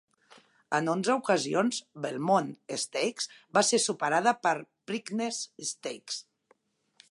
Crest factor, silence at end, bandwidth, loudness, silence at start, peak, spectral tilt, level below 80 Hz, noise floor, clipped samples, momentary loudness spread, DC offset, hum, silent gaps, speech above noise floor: 20 dB; 0.9 s; 11.5 kHz; -29 LUFS; 0.7 s; -10 dBFS; -3 dB/octave; -82 dBFS; -69 dBFS; under 0.1%; 11 LU; under 0.1%; none; none; 40 dB